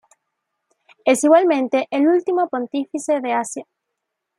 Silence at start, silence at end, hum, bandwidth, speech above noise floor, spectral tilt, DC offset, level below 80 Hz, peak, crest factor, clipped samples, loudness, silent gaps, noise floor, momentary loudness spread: 1.05 s; 0.75 s; none; 14 kHz; 61 dB; -3.5 dB/octave; under 0.1%; -76 dBFS; -2 dBFS; 18 dB; under 0.1%; -18 LUFS; none; -79 dBFS; 11 LU